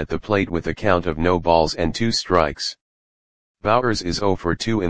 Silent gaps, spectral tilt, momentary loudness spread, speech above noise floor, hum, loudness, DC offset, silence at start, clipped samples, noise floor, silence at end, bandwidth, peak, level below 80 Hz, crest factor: 2.81-3.55 s; -5 dB/octave; 5 LU; over 70 dB; none; -20 LUFS; 1%; 0 s; under 0.1%; under -90 dBFS; 0 s; 10 kHz; 0 dBFS; -40 dBFS; 20 dB